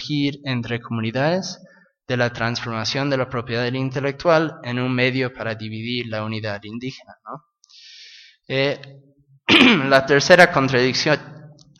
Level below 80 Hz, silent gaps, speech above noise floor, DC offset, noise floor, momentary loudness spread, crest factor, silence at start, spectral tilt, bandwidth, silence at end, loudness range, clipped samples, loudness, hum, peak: -56 dBFS; none; 27 dB; under 0.1%; -47 dBFS; 19 LU; 20 dB; 0 s; -5 dB/octave; 14 kHz; 0.25 s; 12 LU; under 0.1%; -19 LUFS; none; 0 dBFS